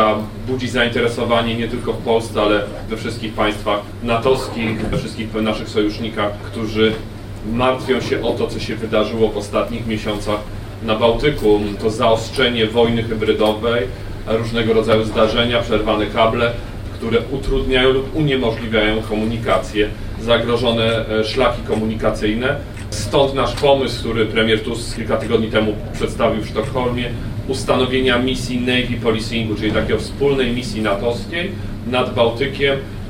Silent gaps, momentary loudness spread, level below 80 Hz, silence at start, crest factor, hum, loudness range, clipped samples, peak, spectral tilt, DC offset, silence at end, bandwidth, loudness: none; 8 LU; -32 dBFS; 0 s; 16 dB; none; 3 LU; under 0.1%; -2 dBFS; -5.5 dB/octave; under 0.1%; 0 s; 16 kHz; -18 LUFS